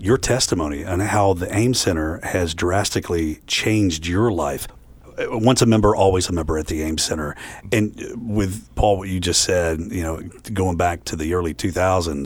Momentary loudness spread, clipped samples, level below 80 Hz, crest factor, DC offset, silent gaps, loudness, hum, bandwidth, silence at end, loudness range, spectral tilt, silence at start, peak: 10 LU; under 0.1%; -36 dBFS; 18 dB; under 0.1%; none; -20 LUFS; none; 19 kHz; 0 s; 2 LU; -4.5 dB/octave; 0 s; -2 dBFS